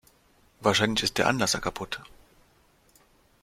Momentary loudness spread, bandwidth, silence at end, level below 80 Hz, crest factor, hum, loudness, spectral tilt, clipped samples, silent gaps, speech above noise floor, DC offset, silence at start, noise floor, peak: 13 LU; 16.5 kHz; 1.4 s; -54 dBFS; 24 dB; none; -26 LUFS; -3 dB/octave; under 0.1%; none; 36 dB; under 0.1%; 0.6 s; -62 dBFS; -6 dBFS